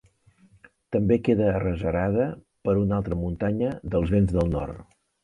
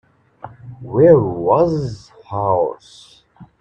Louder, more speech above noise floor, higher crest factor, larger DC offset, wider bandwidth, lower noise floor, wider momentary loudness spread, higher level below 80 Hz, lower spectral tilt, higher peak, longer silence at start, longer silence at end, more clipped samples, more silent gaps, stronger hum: second, -25 LUFS vs -16 LUFS; first, 35 dB vs 24 dB; about the same, 18 dB vs 18 dB; neither; first, 10.5 kHz vs 8.6 kHz; first, -59 dBFS vs -39 dBFS; second, 8 LU vs 25 LU; first, -40 dBFS vs -48 dBFS; about the same, -9.5 dB/octave vs -9 dB/octave; second, -8 dBFS vs 0 dBFS; first, 0.9 s vs 0.45 s; first, 0.4 s vs 0.15 s; neither; neither; neither